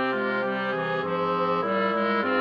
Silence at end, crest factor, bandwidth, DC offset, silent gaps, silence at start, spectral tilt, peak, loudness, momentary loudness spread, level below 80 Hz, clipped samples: 0 s; 12 dB; 6.6 kHz; under 0.1%; none; 0 s; -7.5 dB/octave; -12 dBFS; -25 LUFS; 3 LU; -72 dBFS; under 0.1%